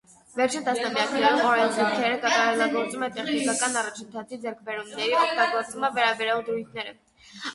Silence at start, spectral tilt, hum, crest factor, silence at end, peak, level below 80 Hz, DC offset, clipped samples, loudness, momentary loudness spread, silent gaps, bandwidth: 0.35 s; -2 dB/octave; none; 18 dB; 0 s; -8 dBFS; -70 dBFS; under 0.1%; under 0.1%; -24 LUFS; 14 LU; none; 11.5 kHz